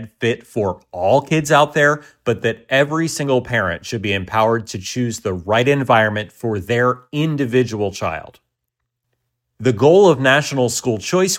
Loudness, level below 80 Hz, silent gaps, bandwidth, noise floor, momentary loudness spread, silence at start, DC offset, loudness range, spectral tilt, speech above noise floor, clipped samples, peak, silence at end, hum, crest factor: -17 LUFS; -52 dBFS; none; 16.5 kHz; -77 dBFS; 11 LU; 0 s; under 0.1%; 4 LU; -5 dB/octave; 60 dB; under 0.1%; 0 dBFS; 0 s; none; 16 dB